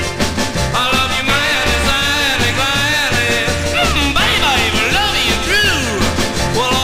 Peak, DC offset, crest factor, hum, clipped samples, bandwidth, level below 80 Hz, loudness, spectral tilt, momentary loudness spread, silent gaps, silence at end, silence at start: -2 dBFS; 0.2%; 14 dB; none; under 0.1%; 16 kHz; -26 dBFS; -13 LUFS; -3 dB/octave; 4 LU; none; 0 s; 0 s